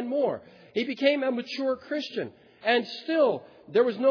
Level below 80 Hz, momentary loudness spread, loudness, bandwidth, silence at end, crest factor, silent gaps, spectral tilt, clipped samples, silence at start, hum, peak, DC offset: -78 dBFS; 10 LU; -27 LUFS; 5.4 kHz; 0 s; 16 dB; none; -5.5 dB/octave; under 0.1%; 0 s; none; -10 dBFS; under 0.1%